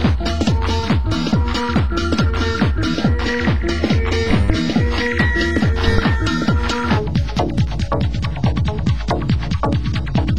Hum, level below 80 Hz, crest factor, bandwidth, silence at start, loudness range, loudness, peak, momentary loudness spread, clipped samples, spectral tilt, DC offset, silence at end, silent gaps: none; -22 dBFS; 16 dB; 9.8 kHz; 0 s; 2 LU; -18 LUFS; -2 dBFS; 3 LU; under 0.1%; -6.5 dB/octave; 3%; 0 s; none